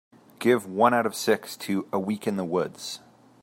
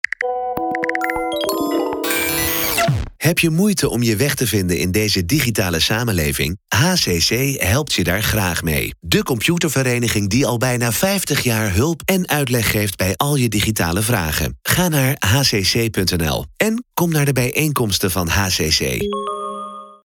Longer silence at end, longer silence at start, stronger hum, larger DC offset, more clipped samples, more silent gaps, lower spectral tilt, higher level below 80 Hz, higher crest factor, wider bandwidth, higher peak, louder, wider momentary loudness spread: first, 0.45 s vs 0.1 s; first, 0.4 s vs 0.2 s; neither; neither; neither; neither; about the same, -5 dB/octave vs -4 dB/octave; second, -74 dBFS vs -38 dBFS; about the same, 20 dB vs 18 dB; second, 16 kHz vs over 20 kHz; second, -6 dBFS vs 0 dBFS; second, -26 LUFS vs -17 LUFS; first, 12 LU vs 5 LU